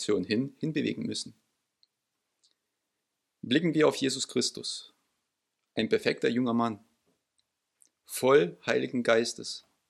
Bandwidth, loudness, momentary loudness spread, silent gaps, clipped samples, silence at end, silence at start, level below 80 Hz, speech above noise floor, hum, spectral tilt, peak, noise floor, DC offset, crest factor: 14.5 kHz; -29 LUFS; 14 LU; none; under 0.1%; 0.3 s; 0 s; -76 dBFS; 55 dB; none; -4.5 dB/octave; -8 dBFS; -83 dBFS; under 0.1%; 22 dB